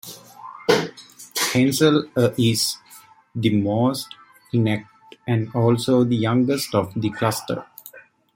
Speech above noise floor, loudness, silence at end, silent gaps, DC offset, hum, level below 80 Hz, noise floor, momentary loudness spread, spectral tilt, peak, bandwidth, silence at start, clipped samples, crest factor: 29 dB; -21 LUFS; 0.35 s; none; under 0.1%; none; -60 dBFS; -49 dBFS; 18 LU; -5 dB/octave; -2 dBFS; 16.5 kHz; 0.05 s; under 0.1%; 20 dB